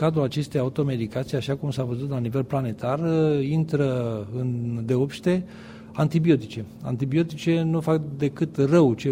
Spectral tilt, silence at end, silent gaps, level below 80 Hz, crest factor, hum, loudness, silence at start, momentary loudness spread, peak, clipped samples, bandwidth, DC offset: -8 dB/octave; 0 s; none; -56 dBFS; 18 dB; none; -24 LUFS; 0 s; 8 LU; -6 dBFS; under 0.1%; 15.5 kHz; under 0.1%